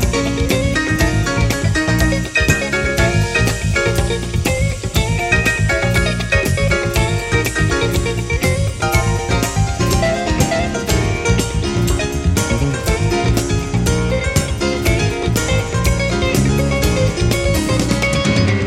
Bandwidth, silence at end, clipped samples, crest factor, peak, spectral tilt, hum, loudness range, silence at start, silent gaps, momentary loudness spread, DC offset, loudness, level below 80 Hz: 16.5 kHz; 0 s; under 0.1%; 16 dB; 0 dBFS; -5 dB/octave; none; 1 LU; 0 s; none; 3 LU; under 0.1%; -16 LUFS; -24 dBFS